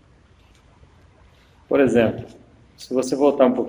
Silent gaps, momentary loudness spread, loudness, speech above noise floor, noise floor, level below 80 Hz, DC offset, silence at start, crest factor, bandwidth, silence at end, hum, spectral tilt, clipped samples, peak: none; 21 LU; -19 LUFS; 35 dB; -53 dBFS; -54 dBFS; under 0.1%; 1.7 s; 20 dB; over 20 kHz; 0 s; none; -6 dB/octave; under 0.1%; -2 dBFS